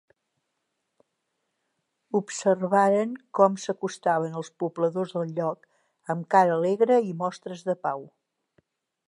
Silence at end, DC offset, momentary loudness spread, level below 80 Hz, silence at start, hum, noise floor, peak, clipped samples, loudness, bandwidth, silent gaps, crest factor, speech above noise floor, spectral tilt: 1.05 s; under 0.1%; 12 LU; -82 dBFS; 2.15 s; none; -79 dBFS; -6 dBFS; under 0.1%; -25 LUFS; 11 kHz; none; 20 dB; 55 dB; -6 dB/octave